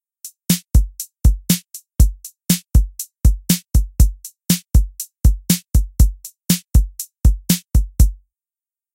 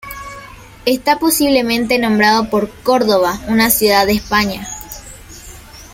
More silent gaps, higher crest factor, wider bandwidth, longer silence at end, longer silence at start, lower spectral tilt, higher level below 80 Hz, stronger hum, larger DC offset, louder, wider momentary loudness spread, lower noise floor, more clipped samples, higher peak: neither; about the same, 16 dB vs 16 dB; about the same, 17 kHz vs 16.5 kHz; first, 0.8 s vs 0.05 s; first, 0.25 s vs 0.05 s; about the same, -4.5 dB/octave vs -3.5 dB/octave; first, -18 dBFS vs -40 dBFS; neither; neither; second, -19 LUFS vs -14 LUFS; second, 11 LU vs 22 LU; first, under -90 dBFS vs -36 dBFS; neither; about the same, 0 dBFS vs 0 dBFS